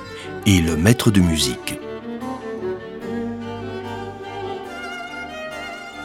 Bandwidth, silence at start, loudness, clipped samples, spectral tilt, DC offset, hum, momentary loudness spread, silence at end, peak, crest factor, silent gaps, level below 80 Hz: 17 kHz; 0 s; -23 LUFS; under 0.1%; -5 dB/octave; under 0.1%; none; 15 LU; 0 s; 0 dBFS; 22 dB; none; -40 dBFS